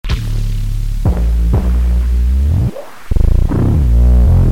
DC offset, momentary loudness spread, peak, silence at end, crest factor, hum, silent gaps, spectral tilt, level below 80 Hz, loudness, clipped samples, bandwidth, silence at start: under 0.1%; 10 LU; 0 dBFS; 0 s; 10 dB; none; none; -8 dB/octave; -12 dBFS; -15 LUFS; under 0.1%; 9.2 kHz; 0.05 s